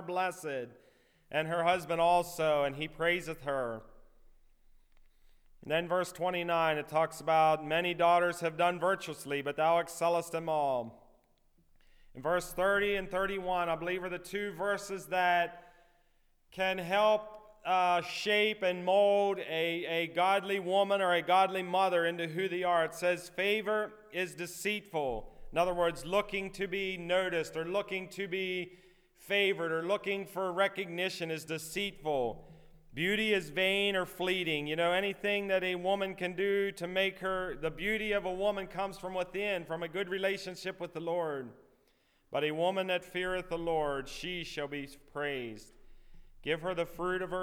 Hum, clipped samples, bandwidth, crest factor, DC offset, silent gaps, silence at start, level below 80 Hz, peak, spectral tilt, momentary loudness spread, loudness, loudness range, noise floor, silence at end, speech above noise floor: none; under 0.1%; 18.5 kHz; 18 dB; under 0.1%; none; 0 s; -58 dBFS; -16 dBFS; -4 dB/octave; 10 LU; -32 LUFS; 6 LU; -70 dBFS; 0 s; 38 dB